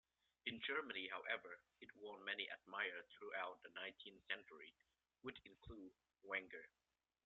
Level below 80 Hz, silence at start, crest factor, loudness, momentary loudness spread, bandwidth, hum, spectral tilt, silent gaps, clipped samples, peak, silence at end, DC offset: -80 dBFS; 0.45 s; 24 dB; -49 LUFS; 16 LU; 7.2 kHz; none; 0 dB/octave; none; under 0.1%; -28 dBFS; 0.6 s; under 0.1%